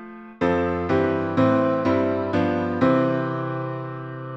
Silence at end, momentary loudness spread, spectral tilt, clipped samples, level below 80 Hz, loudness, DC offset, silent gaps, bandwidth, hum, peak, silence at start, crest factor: 0 s; 11 LU; -8.5 dB/octave; under 0.1%; -52 dBFS; -22 LUFS; under 0.1%; none; 7.4 kHz; none; -6 dBFS; 0 s; 16 dB